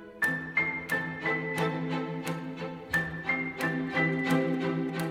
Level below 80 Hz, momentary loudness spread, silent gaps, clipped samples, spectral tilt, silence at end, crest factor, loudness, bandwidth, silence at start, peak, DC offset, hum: -62 dBFS; 7 LU; none; under 0.1%; -6 dB/octave; 0 s; 16 dB; -30 LUFS; 16 kHz; 0 s; -14 dBFS; under 0.1%; none